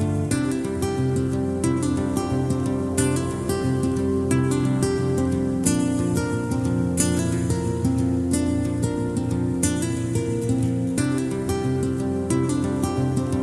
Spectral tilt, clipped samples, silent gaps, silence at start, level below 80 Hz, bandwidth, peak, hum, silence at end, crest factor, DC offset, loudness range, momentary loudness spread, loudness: -6 dB/octave; under 0.1%; none; 0 s; -42 dBFS; 13.5 kHz; -2 dBFS; none; 0 s; 20 dB; under 0.1%; 1 LU; 3 LU; -23 LUFS